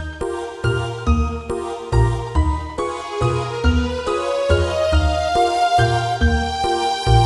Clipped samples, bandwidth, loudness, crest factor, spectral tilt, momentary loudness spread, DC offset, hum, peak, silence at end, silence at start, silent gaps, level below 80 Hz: under 0.1%; 11.5 kHz; -20 LUFS; 16 dB; -6 dB/octave; 8 LU; under 0.1%; none; -2 dBFS; 0 s; 0 s; none; -24 dBFS